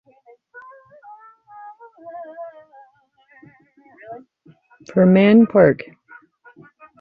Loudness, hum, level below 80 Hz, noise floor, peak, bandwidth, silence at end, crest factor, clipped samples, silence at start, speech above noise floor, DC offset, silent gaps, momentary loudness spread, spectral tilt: -14 LUFS; none; -60 dBFS; -57 dBFS; -2 dBFS; 6.2 kHz; 1.25 s; 20 dB; under 0.1%; 2.05 s; 44 dB; under 0.1%; none; 29 LU; -9.5 dB/octave